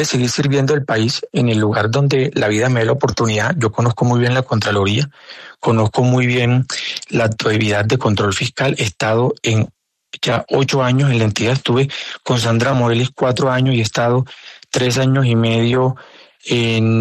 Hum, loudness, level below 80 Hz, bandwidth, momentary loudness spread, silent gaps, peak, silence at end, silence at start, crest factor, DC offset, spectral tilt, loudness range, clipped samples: none; -16 LUFS; -50 dBFS; 13 kHz; 6 LU; none; -2 dBFS; 0 s; 0 s; 14 dB; under 0.1%; -5.5 dB/octave; 1 LU; under 0.1%